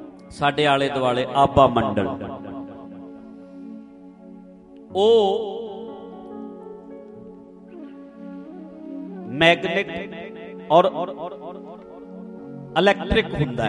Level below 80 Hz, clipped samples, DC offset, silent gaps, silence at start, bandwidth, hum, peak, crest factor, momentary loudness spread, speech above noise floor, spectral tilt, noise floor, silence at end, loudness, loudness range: -46 dBFS; under 0.1%; under 0.1%; none; 0 s; 11 kHz; none; 0 dBFS; 22 dB; 23 LU; 25 dB; -6 dB/octave; -44 dBFS; 0 s; -20 LUFS; 13 LU